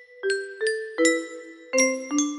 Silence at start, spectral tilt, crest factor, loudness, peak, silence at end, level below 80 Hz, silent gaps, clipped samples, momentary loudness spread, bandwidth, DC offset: 0 s; 0 dB/octave; 20 dB; -24 LUFS; -6 dBFS; 0 s; -74 dBFS; none; under 0.1%; 8 LU; 15 kHz; under 0.1%